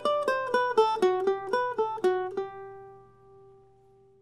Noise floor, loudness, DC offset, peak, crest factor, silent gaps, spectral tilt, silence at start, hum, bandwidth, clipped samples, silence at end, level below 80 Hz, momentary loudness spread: -59 dBFS; -27 LUFS; under 0.1%; -12 dBFS; 18 dB; none; -4.5 dB/octave; 0 s; none; 12.5 kHz; under 0.1%; 1.25 s; -70 dBFS; 16 LU